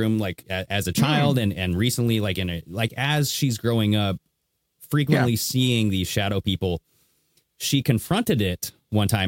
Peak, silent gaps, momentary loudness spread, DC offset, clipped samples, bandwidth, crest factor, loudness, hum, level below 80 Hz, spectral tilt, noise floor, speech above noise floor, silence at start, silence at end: -6 dBFS; none; 7 LU; under 0.1%; under 0.1%; 17 kHz; 18 dB; -23 LUFS; none; -50 dBFS; -5 dB/octave; -75 dBFS; 53 dB; 0 s; 0 s